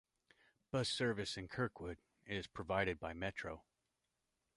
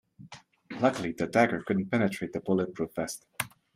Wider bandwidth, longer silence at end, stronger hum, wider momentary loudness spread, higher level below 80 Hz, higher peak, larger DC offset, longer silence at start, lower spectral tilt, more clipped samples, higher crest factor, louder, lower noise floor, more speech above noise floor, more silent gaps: second, 11.5 kHz vs 16 kHz; first, 0.95 s vs 0.3 s; neither; second, 12 LU vs 17 LU; about the same, -64 dBFS vs -66 dBFS; second, -22 dBFS vs -8 dBFS; neither; first, 0.75 s vs 0.2 s; about the same, -4.5 dB/octave vs -5.5 dB/octave; neither; about the same, 22 dB vs 22 dB; second, -42 LUFS vs -29 LUFS; first, -87 dBFS vs -51 dBFS; first, 46 dB vs 23 dB; neither